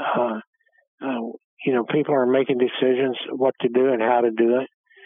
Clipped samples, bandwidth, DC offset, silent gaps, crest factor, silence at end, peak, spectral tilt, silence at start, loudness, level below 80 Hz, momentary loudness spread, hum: under 0.1%; 3.8 kHz; under 0.1%; 0.47-0.53 s, 0.88-0.98 s, 1.44-1.57 s; 16 dB; 0.4 s; -6 dBFS; -9.5 dB/octave; 0 s; -22 LUFS; -86 dBFS; 10 LU; none